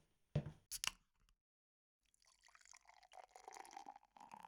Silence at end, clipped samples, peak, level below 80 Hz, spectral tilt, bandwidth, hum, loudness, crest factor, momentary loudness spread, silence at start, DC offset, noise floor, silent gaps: 0 s; under 0.1%; -22 dBFS; -72 dBFS; -3.5 dB/octave; 18 kHz; none; -49 LUFS; 32 dB; 19 LU; 0.35 s; under 0.1%; -75 dBFS; 1.41-2.00 s